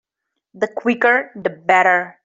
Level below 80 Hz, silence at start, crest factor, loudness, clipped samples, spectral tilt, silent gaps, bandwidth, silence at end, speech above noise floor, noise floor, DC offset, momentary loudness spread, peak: -70 dBFS; 0.55 s; 16 dB; -17 LUFS; under 0.1%; -5 dB/octave; none; 7.8 kHz; 0.15 s; 62 dB; -79 dBFS; under 0.1%; 11 LU; -2 dBFS